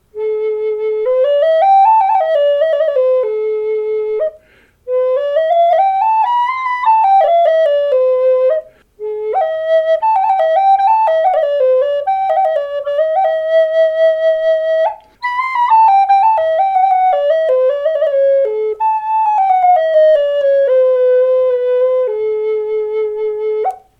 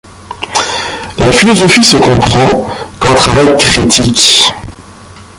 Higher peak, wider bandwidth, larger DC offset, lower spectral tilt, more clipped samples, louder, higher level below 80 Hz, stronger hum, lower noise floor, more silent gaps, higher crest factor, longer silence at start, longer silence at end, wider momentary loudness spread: about the same, -2 dBFS vs 0 dBFS; second, 6.2 kHz vs 16 kHz; neither; about the same, -3 dB/octave vs -3.5 dB/octave; second, under 0.1% vs 0.3%; second, -13 LUFS vs -7 LUFS; second, -58 dBFS vs -30 dBFS; neither; first, -50 dBFS vs -32 dBFS; neither; about the same, 10 dB vs 10 dB; about the same, 0.15 s vs 0.2 s; about the same, 0.25 s vs 0.15 s; second, 8 LU vs 12 LU